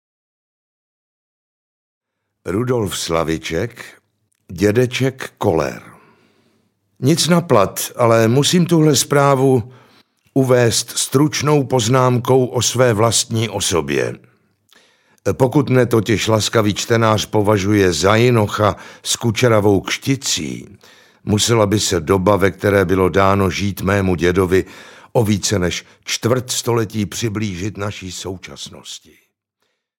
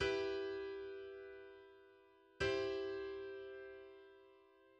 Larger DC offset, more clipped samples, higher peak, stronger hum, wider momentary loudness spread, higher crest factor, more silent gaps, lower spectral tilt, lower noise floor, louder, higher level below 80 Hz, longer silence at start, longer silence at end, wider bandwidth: neither; neither; first, 0 dBFS vs -26 dBFS; neither; second, 12 LU vs 22 LU; about the same, 16 dB vs 20 dB; neither; about the same, -4.5 dB/octave vs -5 dB/octave; first, -71 dBFS vs -67 dBFS; first, -16 LUFS vs -44 LUFS; first, -50 dBFS vs -66 dBFS; first, 2.45 s vs 0 s; first, 1 s vs 0.1 s; first, 17 kHz vs 8.8 kHz